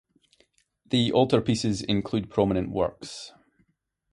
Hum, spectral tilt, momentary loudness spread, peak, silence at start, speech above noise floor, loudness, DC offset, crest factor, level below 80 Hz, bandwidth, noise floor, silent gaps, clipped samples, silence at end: none; -6 dB/octave; 17 LU; -6 dBFS; 0.9 s; 49 dB; -25 LUFS; under 0.1%; 22 dB; -52 dBFS; 11.5 kHz; -74 dBFS; none; under 0.1%; 0.85 s